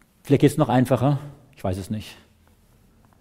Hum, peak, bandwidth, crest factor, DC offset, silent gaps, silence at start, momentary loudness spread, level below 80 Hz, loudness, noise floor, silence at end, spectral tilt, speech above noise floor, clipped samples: none; -4 dBFS; 16 kHz; 20 dB; under 0.1%; none; 0.25 s; 14 LU; -52 dBFS; -22 LUFS; -57 dBFS; 1.05 s; -7.5 dB/octave; 36 dB; under 0.1%